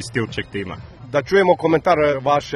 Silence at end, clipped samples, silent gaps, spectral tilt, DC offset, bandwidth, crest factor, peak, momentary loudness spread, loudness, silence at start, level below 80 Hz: 0 s; under 0.1%; none; -6 dB/octave; under 0.1%; 12 kHz; 18 dB; -2 dBFS; 13 LU; -18 LUFS; 0 s; -46 dBFS